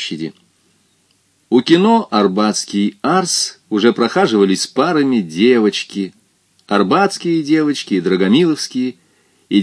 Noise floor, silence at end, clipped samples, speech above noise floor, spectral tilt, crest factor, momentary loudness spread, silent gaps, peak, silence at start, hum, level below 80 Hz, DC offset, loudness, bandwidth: -59 dBFS; 0 s; under 0.1%; 44 dB; -4.5 dB/octave; 16 dB; 9 LU; none; 0 dBFS; 0 s; none; -66 dBFS; under 0.1%; -15 LUFS; 11 kHz